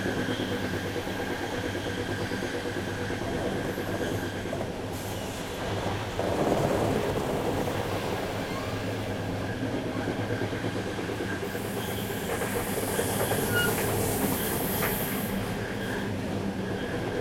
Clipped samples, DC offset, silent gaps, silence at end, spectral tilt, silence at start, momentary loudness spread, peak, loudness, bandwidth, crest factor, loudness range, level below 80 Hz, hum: under 0.1%; under 0.1%; none; 0 s; -5 dB/octave; 0 s; 6 LU; -10 dBFS; -30 LUFS; 16.5 kHz; 20 dB; 4 LU; -48 dBFS; none